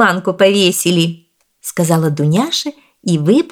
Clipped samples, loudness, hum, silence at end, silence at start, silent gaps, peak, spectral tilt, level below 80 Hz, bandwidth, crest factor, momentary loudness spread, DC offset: under 0.1%; -14 LUFS; none; 0.05 s; 0 s; none; 0 dBFS; -4.5 dB/octave; -60 dBFS; 19 kHz; 14 dB; 14 LU; under 0.1%